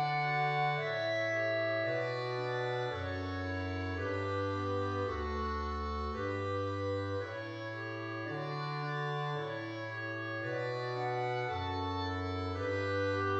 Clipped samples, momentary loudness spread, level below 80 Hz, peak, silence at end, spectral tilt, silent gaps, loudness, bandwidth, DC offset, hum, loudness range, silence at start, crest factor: under 0.1%; 7 LU; -52 dBFS; -22 dBFS; 0 s; -6.5 dB/octave; none; -36 LUFS; 8 kHz; under 0.1%; none; 4 LU; 0 s; 14 dB